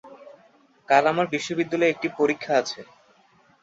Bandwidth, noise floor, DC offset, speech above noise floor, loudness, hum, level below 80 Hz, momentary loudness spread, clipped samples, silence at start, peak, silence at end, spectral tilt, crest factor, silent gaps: 8 kHz; -59 dBFS; under 0.1%; 36 dB; -23 LUFS; none; -70 dBFS; 6 LU; under 0.1%; 0.05 s; -4 dBFS; 0.8 s; -4.5 dB/octave; 22 dB; none